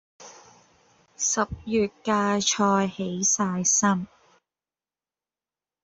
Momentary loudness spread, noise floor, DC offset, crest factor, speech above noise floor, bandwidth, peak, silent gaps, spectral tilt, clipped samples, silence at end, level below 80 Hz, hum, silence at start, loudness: 7 LU; under -90 dBFS; under 0.1%; 20 dB; over 66 dB; 8.2 kHz; -8 dBFS; none; -3 dB/octave; under 0.1%; 1.8 s; -58 dBFS; none; 0.2 s; -23 LUFS